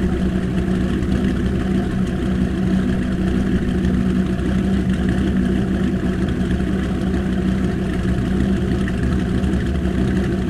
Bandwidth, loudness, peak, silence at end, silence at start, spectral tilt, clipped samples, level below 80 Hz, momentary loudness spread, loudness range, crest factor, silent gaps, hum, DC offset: 11 kHz; -20 LUFS; -4 dBFS; 0 s; 0 s; -8 dB/octave; under 0.1%; -26 dBFS; 2 LU; 1 LU; 14 dB; none; none; under 0.1%